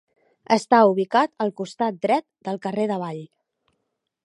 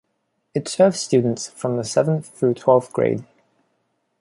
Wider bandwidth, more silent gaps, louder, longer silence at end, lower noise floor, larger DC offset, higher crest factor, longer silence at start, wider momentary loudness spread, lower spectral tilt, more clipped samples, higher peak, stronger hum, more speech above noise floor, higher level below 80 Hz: about the same, 11.5 kHz vs 11.5 kHz; neither; about the same, -22 LUFS vs -20 LUFS; about the same, 1 s vs 0.95 s; first, -77 dBFS vs -72 dBFS; neither; about the same, 20 dB vs 18 dB; about the same, 0.5 s vs 0.55 s; first, 13 LU vs 9 LU; about the same, -5.5 dB/octave vs -5.5 dB/octave; neither; about the same, -2 dBFS vs -2 dBFS; neither; first, 56 dB vs 52 dB; second, -76 dBFS vs -62 dBFS